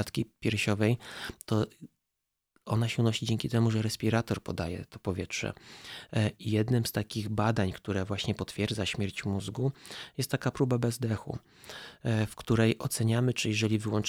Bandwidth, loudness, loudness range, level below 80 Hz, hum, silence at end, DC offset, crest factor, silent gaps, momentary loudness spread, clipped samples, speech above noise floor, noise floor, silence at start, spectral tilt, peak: 16 kHz; -31 LUFS; 2 LU; -56 dBFS; none; 0 s; under 0.1%; 18 dB; none; 11 LU; under 0.1%; 55 dB; -86 dBFS; 0 s; -5.5 dB/octave; -12 dBFS